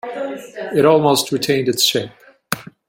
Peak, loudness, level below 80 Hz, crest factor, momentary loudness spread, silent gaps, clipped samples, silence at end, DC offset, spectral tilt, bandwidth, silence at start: -2 dBFS; -17 LUFS; -60 dBFS; 18 dB; 14 LU; none; under 0.1%; 0.25 s; under 0.1%; -3.5 dB/octave; 16.5 kHz; 0.05 s